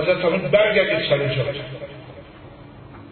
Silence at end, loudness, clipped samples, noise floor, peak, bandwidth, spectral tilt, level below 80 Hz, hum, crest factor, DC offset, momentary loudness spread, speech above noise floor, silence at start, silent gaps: 0 s; -19 LUFS; under 0.1%; -42 dBFS; -4 dBFS; 4.5 kHz; -10.5 dB/octave; -50 dBFS; none; 18 dB; under 0.1%; 24 LU; 22 dB; 0 s; none